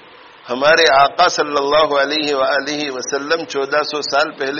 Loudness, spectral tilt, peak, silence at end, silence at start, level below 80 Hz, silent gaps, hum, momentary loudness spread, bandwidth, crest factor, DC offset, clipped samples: -15 LUFS; 0 dB/octave; 0 dBFS; 0 s; 0.45 s; -54 dBFS; none; none; 10 LU; 7.4 kHz; 16 dB; under 0.1%; under 0.1%